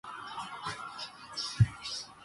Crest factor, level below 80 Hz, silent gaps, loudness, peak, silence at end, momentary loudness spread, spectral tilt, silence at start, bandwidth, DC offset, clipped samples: 22 dB; -52 dBFS; none; -35 LUFS; -12 dBFS; 0 s; 12 LU; -4.5 dB/octave; 0.05 s; 11.5 kHz; under 0.1%; under 0.1%